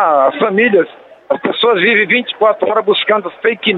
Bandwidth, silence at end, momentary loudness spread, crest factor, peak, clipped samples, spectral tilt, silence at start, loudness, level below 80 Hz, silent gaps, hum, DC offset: 4.6 kHz; 0 s; 7 LU; 12 dB; 0 dBFS; under 0.1%; -7 dB/octave; 0 s; -13 LUFS; -64 dBFS; none; none; under 0.1%